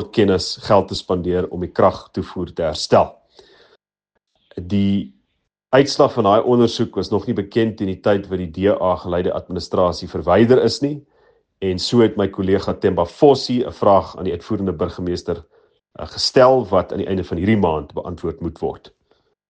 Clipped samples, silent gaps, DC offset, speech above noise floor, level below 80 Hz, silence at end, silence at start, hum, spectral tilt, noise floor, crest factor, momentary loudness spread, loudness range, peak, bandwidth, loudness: under 0.1%; none; under 0.1%; 57 dB; -48 dBFS; 0.7 s; 0 s; none; -6 dB/octave; -75 dBFS; 18 dB; 12 LU; 4 LU; 0 dBFS; 9.4 kHz; -18 LUFS